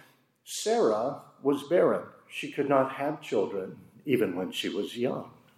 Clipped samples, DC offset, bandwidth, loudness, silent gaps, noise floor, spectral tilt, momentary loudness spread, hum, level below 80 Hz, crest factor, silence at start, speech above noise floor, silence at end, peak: under 0.1%; under 0.1%; 15.5 kHz; -29 LUFS; none; -56 dBFS; -5 dB/octave; 13 LU; none; -82 dBFS; 18 dB; 0.45 s; 28 dB; 0.3 s; -10 dBFS